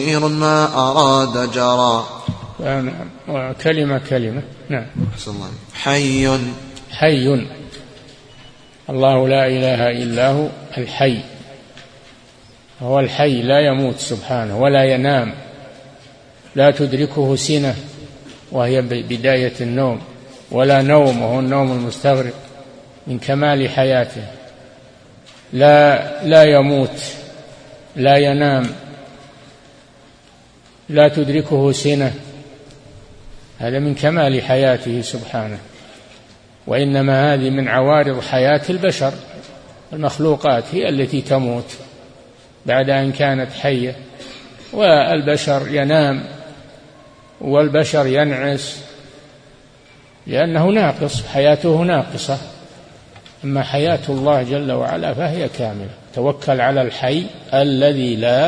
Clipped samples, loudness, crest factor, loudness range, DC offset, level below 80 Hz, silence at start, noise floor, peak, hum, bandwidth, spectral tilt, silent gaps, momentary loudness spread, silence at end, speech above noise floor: under 0.1%; -16 LUFS; 18 dB; 5 LU; under 0.1%; -48 dBFS; 0 s; -47 dBFS; 0 dBFS; none; 10.5 kHz; -6 dB/octave; none; 17 LU; 0 s; 32 dB